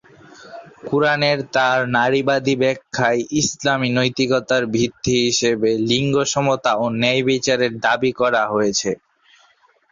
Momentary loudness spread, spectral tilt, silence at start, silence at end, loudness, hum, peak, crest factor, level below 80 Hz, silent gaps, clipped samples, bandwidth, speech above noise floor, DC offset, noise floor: 4 LU; -4 dB/octave; 0.4 s; 0.95 s; -18 LUFS; none; -2 dBFS; 16 dB; -54 dBFS; none; under 0.1%; 7.6 kHz; 38 dB; under 0.1%; -57 dBFS